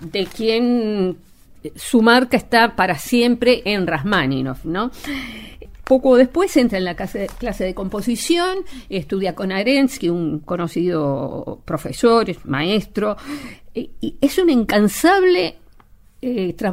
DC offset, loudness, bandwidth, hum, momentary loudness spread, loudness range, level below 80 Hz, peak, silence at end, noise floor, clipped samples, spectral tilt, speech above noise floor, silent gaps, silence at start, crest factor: under 0.1%; -18 LUFS; 16 kHz; none; 14 LU; 4 LU; -42 dBFS; 0 dBFS; 0 s; -47 dBFS; under 0.1%; -5 dB/octave; 29 dB; none; 0 s; 18 dB